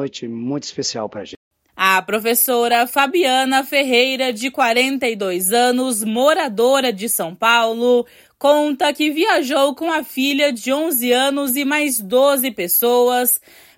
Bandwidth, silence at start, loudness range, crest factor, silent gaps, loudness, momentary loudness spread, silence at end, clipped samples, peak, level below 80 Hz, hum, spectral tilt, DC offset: 16.5 kHz; 0 s; 1 LU; 16 dB; 1.37-1.51 s; -17 LUFS; 8 LU; 0.4 s; under 0.1%; 0 dBFS; -68 dBFS; none; -2 dB/octave; under 0.1%